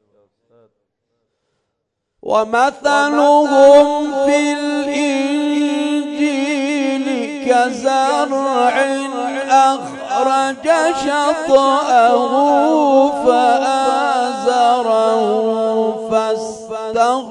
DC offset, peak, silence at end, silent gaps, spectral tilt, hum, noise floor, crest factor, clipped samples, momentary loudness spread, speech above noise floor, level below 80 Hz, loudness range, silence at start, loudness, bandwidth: under 0.1%; 0 dBFS; 0 s; none; -3 dB/octave; none; -74 dBFS; 14 dB; under 0.1%; 7 LU; 61 dB; -60 dBFS; 4 LU; 2.25 s; -15 LUFS; 11 kHz